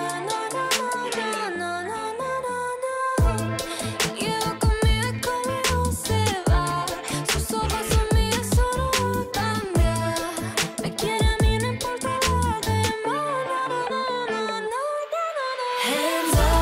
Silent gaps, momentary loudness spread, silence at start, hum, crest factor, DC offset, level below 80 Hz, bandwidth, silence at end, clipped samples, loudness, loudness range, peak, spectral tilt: none; 5 LU; 0 s; none; 14 dB; under 0.1%; -30 dBFS; 16 kHz; 0 s; under 0.1%; -24 LUFS; 3 LU; -10 dBFS; -4 dB/octave